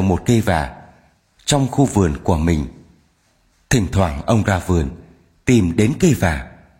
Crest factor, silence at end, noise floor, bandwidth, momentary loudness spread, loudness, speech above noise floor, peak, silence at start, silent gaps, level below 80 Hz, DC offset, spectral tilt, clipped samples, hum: 16 dB; 0.3 s; -60 dBFS; 16.5 kHz; 10 LU; -18 LUFS; 43 dB; -2 dBFS; 0 s; none; -32 dBFS; under 0.1%; -6 dB/octave; under 0.1%; none